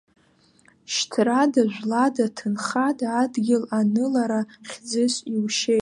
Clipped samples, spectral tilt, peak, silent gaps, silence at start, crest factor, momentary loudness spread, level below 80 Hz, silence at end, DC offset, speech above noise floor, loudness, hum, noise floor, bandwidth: under 0.1%; -4 dB/octave; -6 dBFS; none; 0.9 s; 16 dB; 7 LU; -74 dBFS; 0 s; under 0.1%; 37 dB; -23 LUFS; none; -59 dBFS; 11.5 kHz